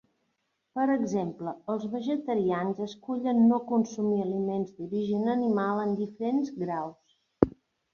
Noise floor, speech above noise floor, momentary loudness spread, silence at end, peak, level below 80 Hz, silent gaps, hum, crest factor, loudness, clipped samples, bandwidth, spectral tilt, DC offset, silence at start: -78 dBFS; 50 dB; 9 LU; 0.45 s; -4 dBFS; -60 dBFS; none; none; 26 dB; -29 LUFS; under 0.1%; 7 kHz; -7.5 dB/octave; under 0.1%; 0.75 s